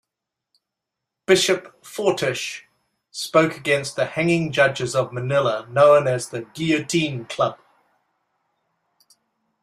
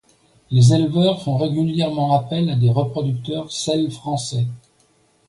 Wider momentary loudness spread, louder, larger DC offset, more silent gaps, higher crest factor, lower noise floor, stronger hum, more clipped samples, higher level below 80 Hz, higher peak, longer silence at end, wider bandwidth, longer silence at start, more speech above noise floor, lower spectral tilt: first, 13 LU vs 10 LU; about the same, -21 LUFS vs -19 LUFS; neither; neither; about the same, 20 dB vs 16 dB; first, -84 dBFS vs -59 dBFS; neither; neither; second, -62 dBFS vs -54 dBFS; about the same, -2 dBFS vs -4 dBFS; first, 2.1 s vs 0.7 s; first, 14.5 kHz vs 11.5 kHz; first, 1.3 s vs 0.5 s; first, 64 dB vs 41 dB; second, -4.5 dB/octave vs -7 dB/octave